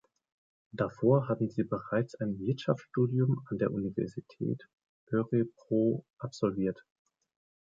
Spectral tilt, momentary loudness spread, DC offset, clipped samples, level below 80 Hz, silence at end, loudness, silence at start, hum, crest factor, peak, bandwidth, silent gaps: -9 dB/octave; 9 LU; under 0.1%; under 0.1%; -66 dBFS; 0.8 s; -32 LUFS; 0.75 s; none; 20 dB; -12 dBFS; 7.6 kHz; 4.73-4.78 s, 4.89-5.07 s, 6.10-6.17 s